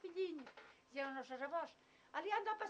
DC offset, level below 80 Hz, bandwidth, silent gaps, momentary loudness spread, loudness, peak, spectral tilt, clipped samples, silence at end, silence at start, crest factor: under 0.1%; under -90 dBFS; 9 kHz; none; 12 LU; -46 LUFS; -26 dBFS; -3 dB/octave; under 0.1%; 0 s; 0.05 s; 20 dB